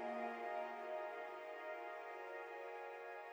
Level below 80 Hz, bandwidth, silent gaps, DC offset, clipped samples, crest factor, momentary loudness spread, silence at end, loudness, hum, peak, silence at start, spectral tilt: under -90 dBFS; over 20 kHz; none; under 0.1%; under 0.1%; 14 dB; 5 LU; 0 s; -48 LUFS; none; -34 dBFS; 0 s; -4 dB/octave